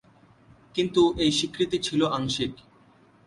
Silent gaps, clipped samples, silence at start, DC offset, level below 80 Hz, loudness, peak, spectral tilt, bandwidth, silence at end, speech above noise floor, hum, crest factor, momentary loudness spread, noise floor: none; under 0.1%; 0.75 s; under 0.1%; -52 dBFS; -25 LUFS; -8 dBFS; -4.5 dB/octave; 11.5 kHz; 0.7 s; 33 dB; none; 18 dB; 8 LU; -57 dBFS